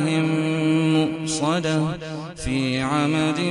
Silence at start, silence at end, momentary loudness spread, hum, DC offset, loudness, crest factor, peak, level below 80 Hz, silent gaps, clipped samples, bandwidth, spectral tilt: 0 s; 0 s; 7 LU; none; under 0.1%; -22 LUFS; 14 dB; -6 dBFS; -44 dBFS; none; under 0.1%; 11.5 kHz; -5.5 dB/octave